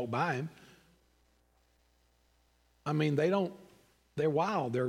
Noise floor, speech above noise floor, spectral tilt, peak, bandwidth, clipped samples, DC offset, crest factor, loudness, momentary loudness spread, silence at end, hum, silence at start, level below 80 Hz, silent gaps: -70 dBFS; 39 dB; -7 dB/octave; -16 dBFS; 12 kHz; under 0.1%; under 0.1%; 18 dB; -32 LUFS; 13 LU; 0 s; none; 0 s; -74 dBFS; none